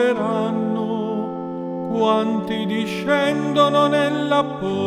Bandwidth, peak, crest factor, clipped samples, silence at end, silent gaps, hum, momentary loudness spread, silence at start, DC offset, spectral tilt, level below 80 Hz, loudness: 13.5 kHz; -4 dBFS; 16 dB; under 0.1%; 0 s; none; none; 9 LU; 0 s; under 0.1%; -6 dB/octave; -60 dBFS; -20 LUFS